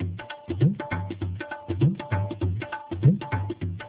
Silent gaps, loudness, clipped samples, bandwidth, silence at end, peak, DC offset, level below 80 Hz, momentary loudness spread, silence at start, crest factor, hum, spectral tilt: none; -27 LUFS; under 0.1%; 4 kHz; 0 s; -8 dBFS; under 0.1%; -42 dBFS; 11 LU; 0 s; 18 dB; none; -12 dB/octave